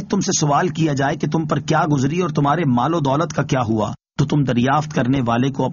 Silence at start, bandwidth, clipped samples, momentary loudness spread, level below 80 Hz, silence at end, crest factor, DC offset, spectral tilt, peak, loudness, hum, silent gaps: 0 s; 7.4 kHz; under 0.1%; 4 LU; -48 dBFS; 0 s; 14 dB; under 0.1%; -6 dB/octave; -4 dBFS; -19 LUFS; none; none